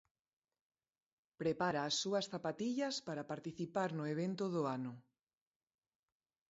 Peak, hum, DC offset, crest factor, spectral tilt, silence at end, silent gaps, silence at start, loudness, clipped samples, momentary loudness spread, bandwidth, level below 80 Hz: -22 dBFS; none; under 0.1%; 20 dB; -4 dB/octave; 1.5 s; none; 1.4 s; -40 LUFS; under 0.1%; 8 LU; 7.6 kHz; -80 dBFS